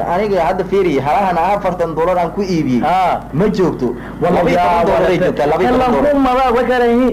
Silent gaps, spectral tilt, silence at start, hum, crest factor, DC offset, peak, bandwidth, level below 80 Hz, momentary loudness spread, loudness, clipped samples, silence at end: none; -7 dB/octave; 0 s; none; 8 dB; under 0.1%; -6 dBFS; 16 kHz; -34 dBFS; 4 LU; -14 LUFS; under 0.1%; 0 s